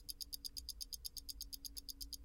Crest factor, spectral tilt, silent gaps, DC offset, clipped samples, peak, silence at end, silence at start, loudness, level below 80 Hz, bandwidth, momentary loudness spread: 24 dB; -0.5 dB/octave; none; under 0.1%; under 0.1%; -26 dBFS; 0 s; 0 s; -47 LUFS; -58 dBFS; 17 kHz; 3 LU